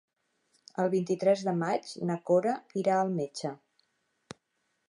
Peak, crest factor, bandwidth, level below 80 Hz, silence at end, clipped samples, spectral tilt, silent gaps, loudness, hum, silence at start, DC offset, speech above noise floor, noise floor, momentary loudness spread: -14 dBFS; 18 dB; 11 kHz; -80 dBFS; 1.35 s; under 0.1%; -6.5 dB/octave; none; -30 LUFS; none; 0.8 s; under 0.1%; 50 dB; -79 dBFS; 9 LU